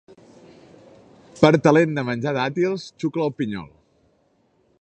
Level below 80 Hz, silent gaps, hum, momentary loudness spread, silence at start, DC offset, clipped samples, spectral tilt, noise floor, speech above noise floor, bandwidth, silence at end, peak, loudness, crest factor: -58 dBFS; none; none; 12 LU; 1.35 s; under 0.1%; under 0.1%; -7 dB/octave; -63 dBFS; 43 dB; 8.8 kHz; 1.15 s; 0 dBFS; -21 LUFS; 22 dB